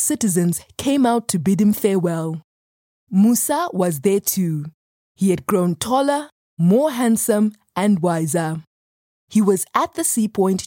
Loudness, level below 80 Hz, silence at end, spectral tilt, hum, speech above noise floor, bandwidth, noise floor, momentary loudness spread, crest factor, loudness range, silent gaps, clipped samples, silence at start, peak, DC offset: -19 LUFS; -60 dBFS; 0 s; -5.5 dB/octave; none; over 72 dB; 17 kHz; under -90 dBFS; 7 LU; 16 dB; 2 LU; 2.44-3.07 s, 4.74-5.15 s, 6.32-6.57 s, 8.67-9.28 s; under 0.1%; 0 s; -2 dBFS; under 0.1%